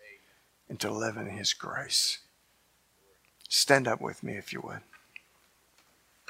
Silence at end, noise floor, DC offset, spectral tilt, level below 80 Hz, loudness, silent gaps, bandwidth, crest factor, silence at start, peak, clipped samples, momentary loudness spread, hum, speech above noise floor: 1.35 s; -68 dBFS; under 0.1%; -2 dB/octave; -74 dBFS; -29 LUFS; none; 16 kHz; 28 dB; 0.05 s; -4 dBFS; under 0.1%; 23 LU; none; 38 dB